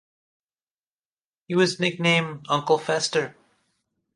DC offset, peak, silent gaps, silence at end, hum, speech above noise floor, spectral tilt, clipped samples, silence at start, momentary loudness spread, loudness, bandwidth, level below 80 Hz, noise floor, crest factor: under 0.1%; -6 dBFS; none; 0.85 s; none; over 67 dB; -4.5 dB/octave; under 0.1%; 1.5 s; 6 LU; -23 LUFS; 11.5 kHz; -72 dBFS; under -90 dBFS; 20 dB